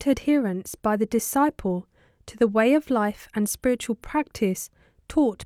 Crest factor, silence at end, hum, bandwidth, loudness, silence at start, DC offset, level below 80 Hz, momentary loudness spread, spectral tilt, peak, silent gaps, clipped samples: 16 dB; 0 s; none; 16 kHz; -24 LUFS; 0 s; under 0.1%; -50 dBFS; 8 LU; -5 dB/octave; -8 dBFS; none; under 0.1%